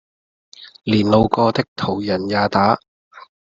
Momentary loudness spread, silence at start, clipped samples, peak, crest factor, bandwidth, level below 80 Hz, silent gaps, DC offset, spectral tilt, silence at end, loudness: 8 LU; 0.6 s; under 0.1%; -2 dBFS; 18 dB; 7.6 kHz; -46 dBFS; 1.68-1.76 s, 2.88-3.11 s; under 0.1%; -7 dB/octave; 0.25 s; -18 LUFS